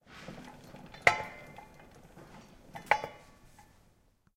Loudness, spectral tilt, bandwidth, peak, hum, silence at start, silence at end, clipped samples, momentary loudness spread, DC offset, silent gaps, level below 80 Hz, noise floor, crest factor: -30 LUFS; -3 dB/octave; 16.5 kHz; -6 dBFS; none; 0.1 s; 1.2 s; under 0.1%; 27 LU; under 0.1%; none; -62 dBFS; -67 dBFS; 32 dB